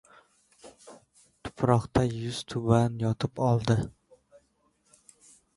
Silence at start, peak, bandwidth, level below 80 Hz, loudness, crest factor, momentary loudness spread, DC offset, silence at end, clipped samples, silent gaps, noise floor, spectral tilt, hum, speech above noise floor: 0.65 s; -6 dBFS; 11.5 kHz; -52 dBFS; -27 LUFS; 22 dB; 16 LU; under 0.1%; 1.7 s; under 0.1%; none; -70 dBFS; -7 dB/octave; none; 44 dB